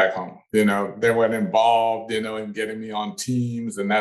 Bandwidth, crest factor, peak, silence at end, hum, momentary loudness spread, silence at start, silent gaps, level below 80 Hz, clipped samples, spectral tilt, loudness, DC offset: 12.5 kHz; 16 dB; -6 dBFS; 0 s; none; 10 LU; 0 s; none; -64 dBFS; under 0.1%; -5 dB/octave; -22 LUFS; under 0.1%